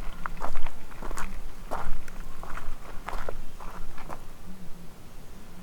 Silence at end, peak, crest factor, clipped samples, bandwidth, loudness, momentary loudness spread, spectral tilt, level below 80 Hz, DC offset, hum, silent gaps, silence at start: 0 s; -8 dBFS; 16 dB; under 0.1%; 8 kHz; -41 LUFS; 11 LU; -5 dB/octave; -32 dBFS; under 0.1%; none; none; 0 s